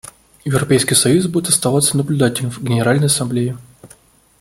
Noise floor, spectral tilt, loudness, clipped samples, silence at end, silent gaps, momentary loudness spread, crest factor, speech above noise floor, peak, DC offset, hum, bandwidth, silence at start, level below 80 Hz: -48 dBFS; -4.5 dB/octave; -15 LUFS; under 0.1%; 0.55 s; none; 9 LU; 16 dB; 33 dB; 0 dBFS; under 0.1%; none; 16.5 kHz; 0.45 s; -50 dBFS